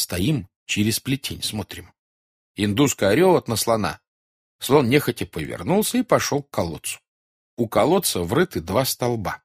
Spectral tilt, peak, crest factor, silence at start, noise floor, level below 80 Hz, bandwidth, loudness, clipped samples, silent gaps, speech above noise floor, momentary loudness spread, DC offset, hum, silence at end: -4.5 dB/octave; -4 dBFS; 18 dB; 0 s; under -90 dBFS; -50 dBFS; 15.5 kHz; -22 LUFS; under 0.1%; 0.56-0.66 s, 1.99-2.55 s, 4.08-4.59 s, 7.08-7.57 s; over 69 dB; 13 LU; under 0.1%; none; 0.1 s